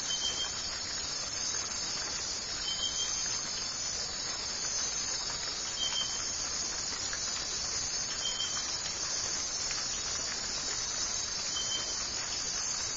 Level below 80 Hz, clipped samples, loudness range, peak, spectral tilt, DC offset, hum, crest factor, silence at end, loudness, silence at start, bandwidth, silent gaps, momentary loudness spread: -56 dBFS; under 0.1%; 0 LU; -20 dBFS; 0.5 dB/octave; under 0.1%; none; 14 dB; 0 s; -32 LUFS; 0 s; 8.2 kHz; none; 3 LU